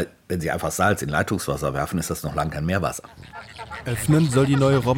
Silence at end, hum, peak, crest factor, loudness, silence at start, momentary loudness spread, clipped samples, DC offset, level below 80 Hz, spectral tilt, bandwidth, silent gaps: 0 s; none; -4 dBFS; 18 dB; -23 LUFS; 0 s; 17 LU; under 0.1%; under 0.1%; -42 dBFS; -5.5 dB/octave; 17 kHz; none